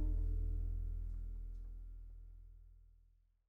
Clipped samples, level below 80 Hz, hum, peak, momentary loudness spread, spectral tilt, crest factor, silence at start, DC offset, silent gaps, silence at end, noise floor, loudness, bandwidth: under 0.1%; -42 dBFS; 60 Hz at -80 dBFS; -30 dBFS; 21 LU; -10.5 dB/octave; 12 dB; 0 s; under 0.1%; none; 0.5 s; -71 dBFS; -46 LUFS; 1.5 kHz